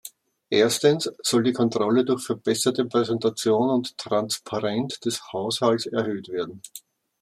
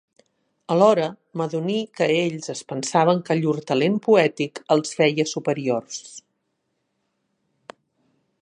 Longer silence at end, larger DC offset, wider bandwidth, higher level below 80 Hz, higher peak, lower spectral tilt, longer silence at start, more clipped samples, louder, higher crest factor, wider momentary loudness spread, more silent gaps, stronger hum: second, 0.45 s vs 2.25 s; neither; first, 15.5 kHz vs 11 kHz; about the same, -70 dBFS vs -74 dBFS; about the same, -6 dBFS vs -4 dBFS; about the same, -4.5 dB/octave vs -5 dB/octave; second, 0.05 s vs 0.7 s; neither; second, -24 LUFS vs -21 LUFS; about the same, 18 dB vs 20 dB; about the same, 9 LU vs 11 LU; neither; neither